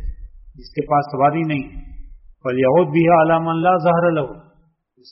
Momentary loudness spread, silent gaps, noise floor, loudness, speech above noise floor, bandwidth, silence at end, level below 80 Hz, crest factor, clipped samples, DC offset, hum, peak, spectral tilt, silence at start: 15 LU; none; -58 dBFS; -17 LUFS; 41 dB; 5.8 kHz; 0.7 s; -38 dBFS; 16 dB; under 0.1%; under 0.1%; none; -4 dBFS; -6.5 dB/octave; 0 s